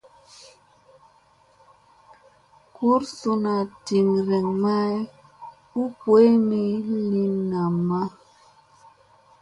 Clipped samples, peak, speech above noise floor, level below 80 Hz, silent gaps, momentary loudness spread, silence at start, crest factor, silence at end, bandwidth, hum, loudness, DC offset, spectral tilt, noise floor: under 0.1%; -6 dBFS; 37 dB; -66 dBFS; none; 14 LU; 2.8 s; 18 dB; 1.35 s; 11 kHz; none; -22 LUFS; under 0.1%; -8 dB/octave; -58 dBFS